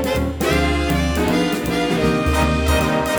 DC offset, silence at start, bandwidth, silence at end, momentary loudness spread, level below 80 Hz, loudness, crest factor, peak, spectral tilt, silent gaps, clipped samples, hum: under 0.1%; 0 s; over 20 kHz; 0 s; 2 LU; -26 dBFS; -18 LUFS; 14 dB; -4 dBFS; -5.5 dB/octave; none; under 0.1%; none